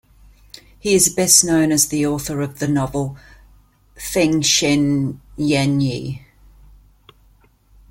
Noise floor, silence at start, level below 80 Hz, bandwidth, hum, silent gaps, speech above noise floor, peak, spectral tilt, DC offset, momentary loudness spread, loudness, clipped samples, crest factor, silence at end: -54 dBFS; 0.85 s; -46 dBFS; 16.5 kHz; none; none; 36 dB; 0 dBFS; -3.5 dB/octave; under 0.1%; 15 LU; -17 LUFS; under 0.1%; 20 dB; 1.75 s